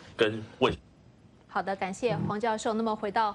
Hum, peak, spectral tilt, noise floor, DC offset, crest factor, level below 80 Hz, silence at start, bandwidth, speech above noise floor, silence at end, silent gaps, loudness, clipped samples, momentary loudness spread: none; -10 dBFS; -5 dB/octave; -57 dBFS; under 0.1%; 20 dB; -56 dBFS; 0 s; 10.5 kHz; 28 dB; 0 s; none; -30 LUFS; under 0.1%; 5 LU